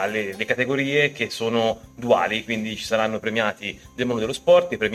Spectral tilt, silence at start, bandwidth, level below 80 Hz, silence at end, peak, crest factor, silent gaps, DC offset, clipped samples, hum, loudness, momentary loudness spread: -4.5 dB/octave; 0 s; 14 kHz; -54 dBFS; 0 s; -6 dBFS; 18 dB; none; under 0.1%; under 0.1%; none; -22 LUFS; 9 LU